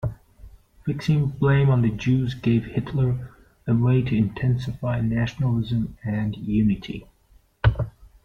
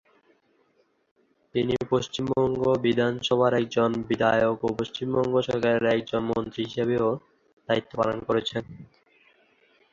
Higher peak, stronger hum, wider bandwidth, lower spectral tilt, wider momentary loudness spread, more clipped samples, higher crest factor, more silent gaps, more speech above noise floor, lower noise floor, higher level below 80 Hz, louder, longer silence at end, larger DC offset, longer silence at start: about the same, -6 dBFS vs -8 dBFS; neither; second, 6.8 kHz vs 7.6 kHz; first, -8.5 dB/octave vs -6 dB/octave; first, 11 LU vs 7 LU; neither; about the same, 18 dB vs 18 dB; second, none vs 7.53-7.57 s; second, 36 dB vs 43 dB; second, -57 dBFS vs -67 dBFS; first, -40 dBFS vs -58 dBFS; about the same, -23 LUFS vs -25 LUFS; second, 0.15 s vs 1.1 s; neither; second, 0 s vs 1.55 s